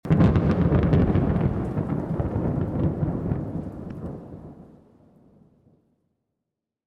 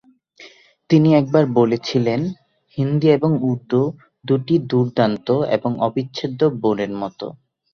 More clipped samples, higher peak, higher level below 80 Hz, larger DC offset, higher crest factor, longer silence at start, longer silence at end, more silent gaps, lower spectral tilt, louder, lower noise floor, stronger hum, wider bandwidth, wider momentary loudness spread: neither; second, -8 dBFS vs -2 dBFS; first, -36 dBFS vs -58 dBFS; neither; about the same, 16 dB vs 18 dB; second, 0.05 s vs 0.4 s; first, 2.25 s vs 0.4 s; neither; first, -10.5 dB/octave vs -8 dB/octave; second, -24 LUFS vs -19 LUFS; first, -84 dBFS vs -46 dBFS; neither; second, 6 kHz vs 6.8 kHz; first, 17 LU vs 12 LU